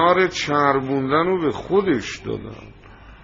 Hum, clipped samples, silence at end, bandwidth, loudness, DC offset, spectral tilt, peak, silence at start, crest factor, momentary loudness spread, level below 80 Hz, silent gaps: none; under 0.1%; 0.05 s; 7.6 kHz; -20 LUFS; under 0.1%; -4 dB/octave; -2 dBFS; 0 s; 18 dB; 13 LU; -48 dBFS; none